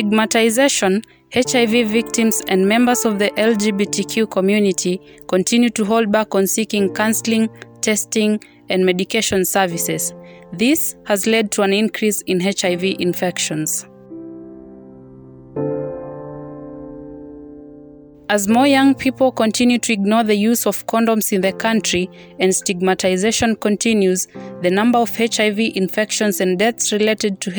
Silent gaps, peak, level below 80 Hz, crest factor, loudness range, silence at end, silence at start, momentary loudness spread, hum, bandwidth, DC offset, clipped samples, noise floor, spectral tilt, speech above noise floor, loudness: none; -4 dBFS; -56 dBFS; 14 dB; 8 LU; 0 s; 0 s; 13 LU; none; over 20 kHz; under 0.1%; under 0.1%; -41 dBFS; -3.5 dB/octave; 25 dB; -17 LUFS